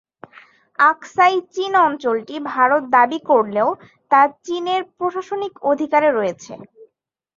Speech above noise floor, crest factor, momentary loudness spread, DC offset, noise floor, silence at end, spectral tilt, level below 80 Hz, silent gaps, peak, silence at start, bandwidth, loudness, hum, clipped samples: 49 dB; 18 dB; 10 LU; under 0.1%; -66 dBFS; 0.55 s; -4.5 dB/octave; -70 dBFS; none; -2 dBFS; 0.8 s; 7.6 kHz; -18 LUFS; none; under 0.1%